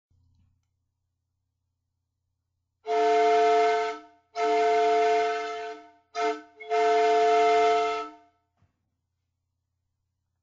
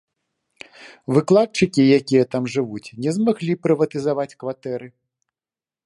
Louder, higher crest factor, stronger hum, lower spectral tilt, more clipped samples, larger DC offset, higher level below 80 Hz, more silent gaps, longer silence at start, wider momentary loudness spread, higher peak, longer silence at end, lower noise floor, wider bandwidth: second, -24 LUFS vs -20 LUFS; about the same, 14 dB vs 18 dB; neither; second, -2 dB/octave vs -6.5 dB/octave; neither; neither; second, -72 dBFS vs -60 dBFS; neither; first, 2.85 s vs 0.8 s; first, 17 LU vs 14 LU; second, -14 dBFS vs -2 dBFS; first, 2.3 s vs 0.95 s; second, -81 dBFS vs under -90 dBFS; second, 7.8 kHz vs 11.5 kHz